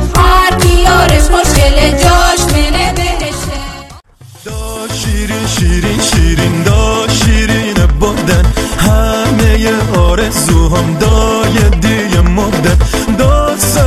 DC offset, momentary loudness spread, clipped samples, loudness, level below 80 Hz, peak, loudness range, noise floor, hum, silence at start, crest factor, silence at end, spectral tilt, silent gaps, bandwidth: under 0.1%; 8 LU; under 0.1%; -10 LUFS; -14 dBFS; 0 dBFS; 5 LU; -35 dBFS; none; 0 s; 10 dB; 0 s; -4.5 dB/octave; none; 14 kHz